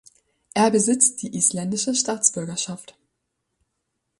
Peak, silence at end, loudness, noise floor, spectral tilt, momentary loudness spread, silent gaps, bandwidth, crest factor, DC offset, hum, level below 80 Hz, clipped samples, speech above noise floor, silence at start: -2 dBFS; 1.35 s; -21 LUFS; -77 dBFS; -3 dB/octave; 11 LU; none; 11.5 kHz; 24 dB; under 0.1%; none; -66 dBFS; under 0.1%; 55 dB; 0.55 s